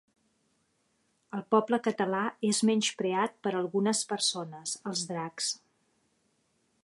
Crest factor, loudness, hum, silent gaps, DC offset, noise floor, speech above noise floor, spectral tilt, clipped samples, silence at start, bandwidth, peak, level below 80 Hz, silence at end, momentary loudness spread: 20 dB; -30 LUFS; none; none; under 0.1%; -74 dBFS; 44 dB; -3.5 dB/octave; under 0.1%; 1.35 s; 11.5 kHz; -12 dBFS; -80 dBFS; 1.25 s; 10 LU